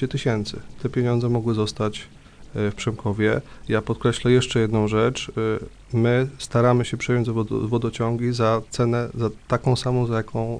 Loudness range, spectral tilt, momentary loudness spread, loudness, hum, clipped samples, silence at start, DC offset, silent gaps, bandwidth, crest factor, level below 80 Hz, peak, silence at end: 3 LU; -6.5 dB/octave; 8 LU; -23 LUFS; none; under 0.1%; 0 s; under 0.1%; none; 10.5 kHz; 16 dB; -44 dBFS; -6 dBFS; 0 s